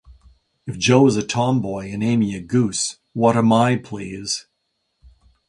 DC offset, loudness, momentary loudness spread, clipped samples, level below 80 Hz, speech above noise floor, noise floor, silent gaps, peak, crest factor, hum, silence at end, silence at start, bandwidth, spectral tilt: under 0.1%; -19 LUFS; 12 LU; under 0.1%; -52 dBFS; 54 dB; -73 dBFS; none; 0 dBFS; 20 dB; none; 1.1 s; 0.1 s; 11.5 kHz; -5.5 dB/octave